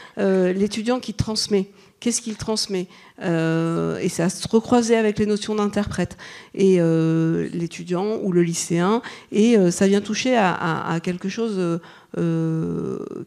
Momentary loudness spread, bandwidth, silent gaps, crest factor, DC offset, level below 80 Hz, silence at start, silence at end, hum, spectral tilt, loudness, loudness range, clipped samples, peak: 10 LU; 13 kHz; none; 16 dB; under 0.1%; -50 dBFS; 0 s; 0 s; none; -5.5 dB/octave; -21 LUFS; 4 LU; under 0.1%; -6 dBFS